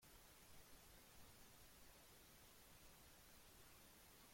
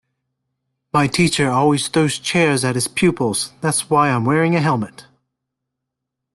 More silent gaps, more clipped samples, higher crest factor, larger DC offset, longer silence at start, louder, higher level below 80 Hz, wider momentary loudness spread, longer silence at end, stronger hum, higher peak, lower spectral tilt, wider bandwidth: neither; neither; about the same, 14 dB vs 16 dB; neither; second, 0 s vs 0.95 s; second, -66 LUFS vs -17 LUFS; second, -74 dBFS vs -54 dBFS; second, 0 LU vs 5 LU; second, 0 s vs 1.35 s; neither; second, -52 dBFS vs -4 dBFS; second, -2.5 dB/octave vs -4.5 dB/octave; first, 16.5 kHz vs 12.5 kHz